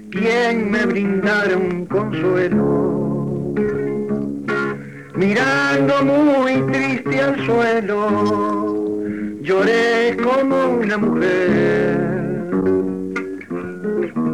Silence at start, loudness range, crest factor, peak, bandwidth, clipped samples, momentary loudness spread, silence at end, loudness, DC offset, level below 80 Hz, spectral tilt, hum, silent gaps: 0 s; 3 LU; 10 dB; -6 dBFS; 12 kHz; under 0.1%; 8 LU; 0 s; -18 LUFS; 0.3%; -52 dBFS; -6.5 dB/octave; none; none